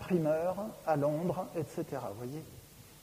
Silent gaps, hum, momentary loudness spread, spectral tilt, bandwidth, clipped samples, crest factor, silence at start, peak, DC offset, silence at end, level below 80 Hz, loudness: none; none; 17 LU; -7.5 dB/octave; 15.5 kHz; under 0.1%; 16 dB; 0 s; -18 dBFS; under 0.1%; 0 s; -64 dBFS; -35 LUFS